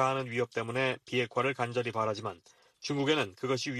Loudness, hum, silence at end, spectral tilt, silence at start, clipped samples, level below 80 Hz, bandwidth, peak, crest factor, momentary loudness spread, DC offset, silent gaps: -32 LUFS; none; 0 s; -5 dB/octave; 0 s; under 0.1%; -72 dBFS; 13 kHz; -14 dBFS; 18 dB; 8 LU; under 0.1%; none